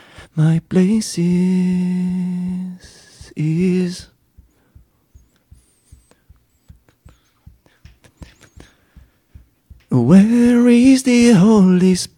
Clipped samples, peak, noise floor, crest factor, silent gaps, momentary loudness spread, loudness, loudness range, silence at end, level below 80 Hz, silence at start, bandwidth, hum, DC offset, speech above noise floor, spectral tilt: under 0.1%; -2 dBFS; -53 dBFS; 16 dB; none; 14 LU; -14 LUFS; 12 LU; 0.1 s; -48 dBFS; 0.2 s; 12.5 kHz; none; under 0.1%; 39 dB; -7 dB/octave